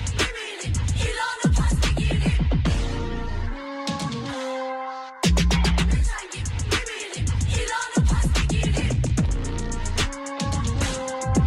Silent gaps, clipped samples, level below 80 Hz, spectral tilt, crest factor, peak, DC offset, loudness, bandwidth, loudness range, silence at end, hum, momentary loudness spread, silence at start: none; under 0.1%; -26 dBFS; -5 dB/octave; 12 dB; -10 dBFS; under 0.1%; -25 LUFS; 13 kHz; 2 LU; 0 s; none; 9 LU; 0 s